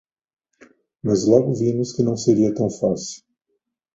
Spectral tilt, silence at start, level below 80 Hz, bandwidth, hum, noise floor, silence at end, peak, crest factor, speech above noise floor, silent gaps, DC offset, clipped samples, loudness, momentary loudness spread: -7 dB/octave; 1.05 s; -56 dBFS; 8 kHz; none; -75 dBFS; 0.8 s; -2 dBFS; 20 dB; 56 dB; none; under 0.1%; under 0.1%; -20 LUFS; 12 LU